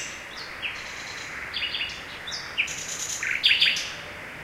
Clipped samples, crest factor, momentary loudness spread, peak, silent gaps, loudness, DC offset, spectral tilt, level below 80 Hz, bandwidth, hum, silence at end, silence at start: under 0.1%; 22 dB; 15 LU; -6 dBFS; none; -26 LUFS; under 0.1%; 0.5 dB/octave; -56 dBFS; 16 kHz; none; 0 s; 0 s